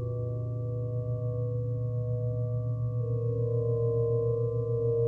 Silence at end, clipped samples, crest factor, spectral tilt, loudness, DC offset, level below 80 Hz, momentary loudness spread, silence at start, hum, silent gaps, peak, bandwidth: 0 s; under 0.1%; 12 dB; -13 dB/octave; -31 LUFS; under 0.1%; -52 dBFS; 5 LU; 0 s; none; none; -18 dBFS; 1.2 kHz